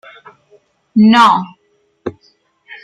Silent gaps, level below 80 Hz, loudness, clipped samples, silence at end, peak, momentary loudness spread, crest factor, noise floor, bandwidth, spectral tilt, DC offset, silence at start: none; -60 dBFS; -10 LUFS; under 0.1%; 0.1 s; 0 dBFS; 21 LU; 16 dB; -60 dBFS; 10 kHz; -5.5 dB/octave; under 0.1%; 0.95 s